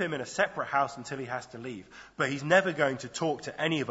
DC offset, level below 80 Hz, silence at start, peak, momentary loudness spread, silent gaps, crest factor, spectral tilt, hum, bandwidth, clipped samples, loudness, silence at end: under 0.1%; -68 dBFS; 0 s; -8 dBFS; 16 LU; none; 22 dB; -4.5 dB/octave; none; 8 kHz; under 0.1%; -30 LUFS; 0 s